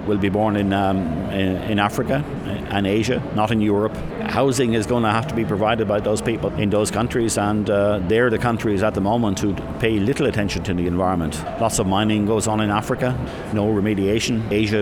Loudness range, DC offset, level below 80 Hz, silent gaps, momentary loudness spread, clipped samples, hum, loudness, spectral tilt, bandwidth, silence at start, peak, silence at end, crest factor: 1 LU; under 0.1%; -40 dBFS; none; 4 LU; under 0.1%; none; -20 LUFS; -5.5 dB/octave; 17.5 kHz; 0 s; -4 dBFS; 0 s; 16 dB